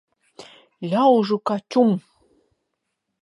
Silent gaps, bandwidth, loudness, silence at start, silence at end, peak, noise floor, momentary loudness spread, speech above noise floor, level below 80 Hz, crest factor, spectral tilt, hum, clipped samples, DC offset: none; 11.5 kHz; -20 LUFS; 0.4 s; 1.25 s; -4 dBFS; -78 dBFS; 10 LU; 59 dB; -74 dBFS; 18 dB; -7.5 dB/octave; none; under 0.1%; under 0.1%